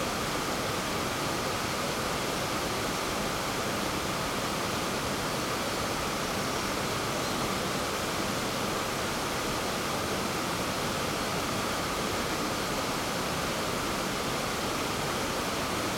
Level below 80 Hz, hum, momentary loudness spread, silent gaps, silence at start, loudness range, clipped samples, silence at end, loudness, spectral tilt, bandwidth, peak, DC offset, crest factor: -50 dBFS; none; 0 LU; none; 0 s; 0 LU; under 0.1%; 0 s; -30 LUFS; -3 dB/octave; 18 kHz; -18 dBFS; under 0.1%; 14 dB